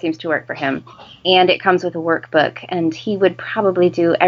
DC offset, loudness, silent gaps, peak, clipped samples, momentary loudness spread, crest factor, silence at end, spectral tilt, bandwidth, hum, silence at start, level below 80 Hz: under 0.1%; -17 LUFS; none; 0 dBFS; under 0.1%; 9 LU; 16 dB; 0 s; -6 dB/octave; 7.2 kHz; none; 0.05 s; -62 dBFS